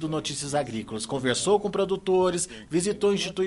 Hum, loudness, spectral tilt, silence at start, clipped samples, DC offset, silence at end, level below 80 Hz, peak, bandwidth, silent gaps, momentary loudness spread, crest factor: none; -26 LUFS; -4 dB/octave; 0 s; under 0.1%; under 0.1%; 0 s; -56 dBFS; -10 dBFS; 11.5 kHz; none; 7 LU; 16 dB